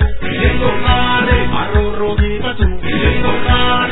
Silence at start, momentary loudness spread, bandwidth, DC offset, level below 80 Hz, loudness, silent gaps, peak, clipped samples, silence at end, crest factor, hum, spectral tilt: 0 s; 5 LU; 4.1 kHz; under 0.1%; -18 dBFS; -15 LUFS; none; 0 dBFS; under 0.1%; 0 s; 12 dB; none; -9.5 dB/octave